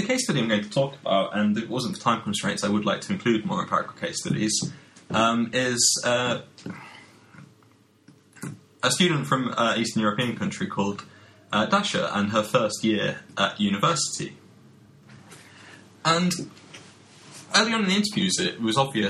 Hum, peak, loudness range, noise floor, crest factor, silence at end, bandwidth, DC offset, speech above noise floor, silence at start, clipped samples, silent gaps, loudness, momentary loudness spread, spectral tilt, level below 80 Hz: none; -2 dBFS; 4 LU; -58 dBFS; 22 dB; 0 s; 13.5 kHz; under 0.1%; 34 dB; 0 s; under 0.1%; none; -24 LUFS; 13 LU; -3.5 dB/octave; -64 dBFS